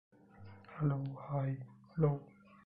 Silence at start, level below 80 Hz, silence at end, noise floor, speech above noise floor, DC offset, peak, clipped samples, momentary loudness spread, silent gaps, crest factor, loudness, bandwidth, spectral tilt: 0.4 s; -64 dBFS; 0.35 s; -56 dBFS; 21 dB; under 0.1%; -20 dBFS; under 0.1%; 22 LU; none; 20 dB; -38 LUFS; 4.6 kHz; -12 dB/octave